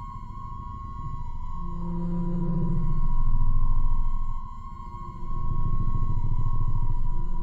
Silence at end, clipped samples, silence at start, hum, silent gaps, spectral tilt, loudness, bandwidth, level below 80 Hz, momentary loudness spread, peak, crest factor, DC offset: 0 s; under 0.1%; 0 s; none; none; -10.5 dB/octave; -32 LUFS; 1.5 kHz; -24 dBFS; 11 LU; -12 dBFS; 12 dB; under 0.1%